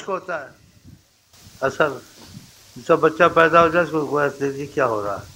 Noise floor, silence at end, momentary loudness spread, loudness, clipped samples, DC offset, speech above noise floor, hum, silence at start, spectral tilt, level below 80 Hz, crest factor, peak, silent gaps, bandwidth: -53 dBFS; 0.05 s; 15 LU; -19 LUFS; under 0.1%; under 0.1%; 33 dB; none; 0 s; -5.5 dB/octave; -54 dBFS; 20 dB; 0 dBFS; none; 16 kHz